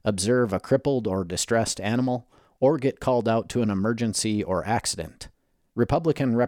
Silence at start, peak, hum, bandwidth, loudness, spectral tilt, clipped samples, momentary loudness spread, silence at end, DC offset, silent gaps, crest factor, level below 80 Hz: 0.05 s; -8 dBFS; none; 17 kHz; -25 LUFS; -5 dB/octave; under 0.1%; 7 LU; 0 s; under 0.1%; none; 16 dB; -50 dBFS